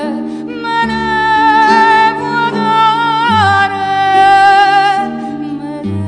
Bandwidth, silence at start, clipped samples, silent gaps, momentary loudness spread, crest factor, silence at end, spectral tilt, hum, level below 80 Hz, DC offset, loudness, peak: 10 kHz; 0 s; under 0.1%; none; 14 LU; 10 dB; 0 s; -5 dB/octave; none; -46 dBFS; under 0.1%; -10 LUFS; 0 dBFS